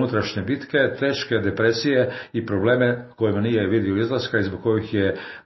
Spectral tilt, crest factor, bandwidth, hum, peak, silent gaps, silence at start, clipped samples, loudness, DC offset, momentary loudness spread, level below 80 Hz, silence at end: -5 dB/octave; 16 dB; 6.2 kHz; none; -6 dBFS; none; 0 s; under 0.1%; -22 LUFS; under 0.1%; 5 LU; -56 dBFS; 0.05 s